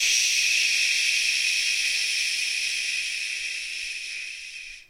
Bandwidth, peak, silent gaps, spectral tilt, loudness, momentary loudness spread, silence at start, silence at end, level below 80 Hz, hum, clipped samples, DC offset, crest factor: 16 kHz; -10 dBFS; none; 5 dB/octave; -22 LUFS; 12 LU; 0 s; 0.05 s; -64 dBFS; none; under 0.1%; under 0.1%; 16 dB